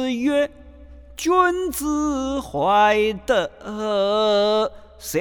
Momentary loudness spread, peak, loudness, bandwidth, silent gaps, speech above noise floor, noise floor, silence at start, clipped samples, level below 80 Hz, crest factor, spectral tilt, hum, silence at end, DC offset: 10 LU; -4 dBFS; -21 LUFS; 19.5 kHz; none; 22 dB; -42 dBFS; 0 s; under 0.1%; -46 dBFS; 16 dB; -4 dB/octave; none; 0 s; under 0.1%